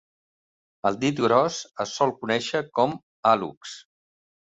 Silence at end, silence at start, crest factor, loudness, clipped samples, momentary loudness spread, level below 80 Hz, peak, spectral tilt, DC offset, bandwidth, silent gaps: 0.6 s; 0.85 s; 20 dB; -24 LUFS; under 0.1%; 13 LU; -66 dBFS; -6 dBFS; -4.5 dB/octave; under 0.1%; 8.2 kHz; 3.03-3.23 s, 3.57-3.61 s